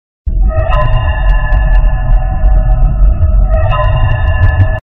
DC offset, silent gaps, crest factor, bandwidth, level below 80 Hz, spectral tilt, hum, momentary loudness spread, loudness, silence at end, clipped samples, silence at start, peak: 5%; none; 8 dB; 3.9 kHz; -10 dBFS; -9 dB/octave; none; 3 LU; -13 LUFS; 0.1 s; under 0.1%; 0.25 s; 0 dBFS